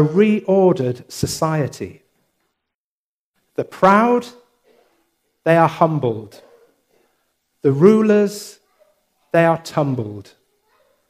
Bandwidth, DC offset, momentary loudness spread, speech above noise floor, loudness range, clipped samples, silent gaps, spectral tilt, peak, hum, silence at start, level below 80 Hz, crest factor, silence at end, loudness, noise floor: 15.5 kHz; under 0.1%; 18 LU; over 74 dB; 4 LU; under 0.1%; 2.74-3.34 s; -6.5 dB/octave; 0 dBFS; none; 0 s; -56 dBFS; 18 dB; 0.85 s; -17 LUFS; under -90 dBFS